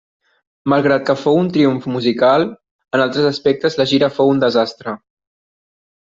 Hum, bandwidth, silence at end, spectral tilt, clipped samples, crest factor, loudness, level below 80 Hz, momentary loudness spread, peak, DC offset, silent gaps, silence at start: none; 7.6 kHz; 1.05 s; -6.5 dB/octave; under 0.1%; 14 dB; -16 LUFS; -58 dBFS; 9 LU; -2 dBFS; under 0.1%; 2.71-2.79 s; 0.65 s